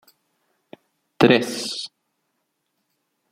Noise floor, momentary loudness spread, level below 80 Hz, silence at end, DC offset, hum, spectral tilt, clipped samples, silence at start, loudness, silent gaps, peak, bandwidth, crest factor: -75 dBFS; 15 LU; -62 dBFS; 1.45 s; under 0.1%; none; -4.5 dB/octave; under 0.1%; 1.2 s; -20 LUFS; none; -2 dBFS; 16 kHz; 24 dB